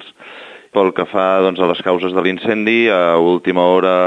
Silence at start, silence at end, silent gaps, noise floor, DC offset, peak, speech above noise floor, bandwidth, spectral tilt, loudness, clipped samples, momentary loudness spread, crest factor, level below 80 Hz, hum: 0 s; 0 s; none; -36 dBFS; under 0.1%; 0 dBFS; 23 dB; 7.8 kHz; -7 dB/octave; -14 LUFS; under 0.1%; 14 LU; 14 dB; -62 dBFS; none